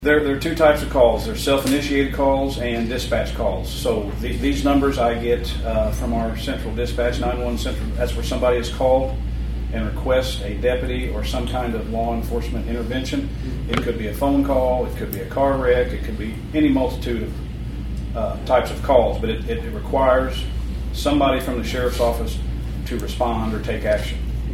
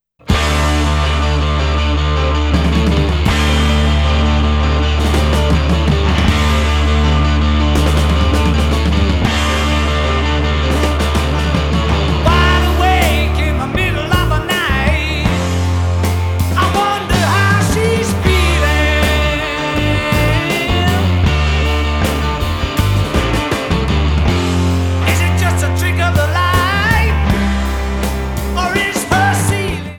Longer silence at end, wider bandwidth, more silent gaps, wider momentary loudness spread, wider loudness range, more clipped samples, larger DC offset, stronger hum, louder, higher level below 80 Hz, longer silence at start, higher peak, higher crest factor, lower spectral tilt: about the same, 0 s vs 0 s; about the same, 16 kHz vs 17.5 kHz; neither; first, 9 LU vs 4 LU; about the same, 3 LU vs 2 LU; neither; neither; neither; second, -21 LUFS vs -14 LUFS; second, -28 dBFS vs -18 dBFS; second, 0 s vs 0.25 s; about the same, 0 dBFS vs 0 dBFS; first, 20 dB vs 14 dB; about the same, -6 dB/octave vs -5.5 dB/octave